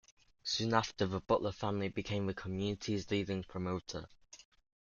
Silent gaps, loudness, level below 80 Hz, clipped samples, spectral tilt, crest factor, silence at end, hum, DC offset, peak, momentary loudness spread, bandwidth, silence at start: none; -37 LUFS; -62 dBFS; under 0.1%; -5 dB/octave; 24 dB; 0.4 s; none; under 0.1%; -14 dBFS; 14 LU; 7.4 kHz; 0.45 s